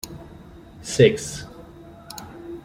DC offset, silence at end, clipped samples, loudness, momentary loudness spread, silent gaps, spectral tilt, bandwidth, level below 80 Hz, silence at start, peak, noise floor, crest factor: under 0.1%; 0.05 s; under 0.1%; -20 LUFS; 27 LU; none; -5 dB/octave; 16.5 kHz; -50 dBFS; 0.05 s; -2 dBFS; -44 dBFS; 22 dB